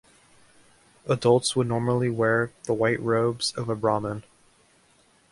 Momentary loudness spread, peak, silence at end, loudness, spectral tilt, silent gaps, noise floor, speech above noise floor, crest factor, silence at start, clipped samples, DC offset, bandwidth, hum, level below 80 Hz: 8 LU; -6 dBFS; 1.1 s; -25 LUFS; -5 dB/octave; none; -61 dBFS; 37 dB; 20 dB; 1.05 s; under 0.1%; under 0.1%; 11.5 kHz; none; -60 dBFS